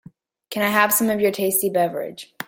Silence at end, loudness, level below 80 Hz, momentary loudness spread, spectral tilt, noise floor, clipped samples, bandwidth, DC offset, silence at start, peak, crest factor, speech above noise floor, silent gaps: 0.05 s; -19 LUFS; -64 dBFS; 14 LU; -3.5 dB/octave; -42 dBFS; under 0.1%; 17 kHz; under 0.1%; 0.5 s; -2 dBFS; 20 dB; 21 dB; none